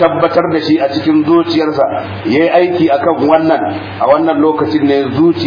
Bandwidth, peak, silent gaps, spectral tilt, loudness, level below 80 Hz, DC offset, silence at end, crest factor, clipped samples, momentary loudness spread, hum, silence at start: 5.2 kHz; 0 dBFS; none; -8 dB/octave; -12 LUFS; -50 dBFS; under 0.1%; 0 s; 10 dB; under 0.1%; 5 LU; none; 0 s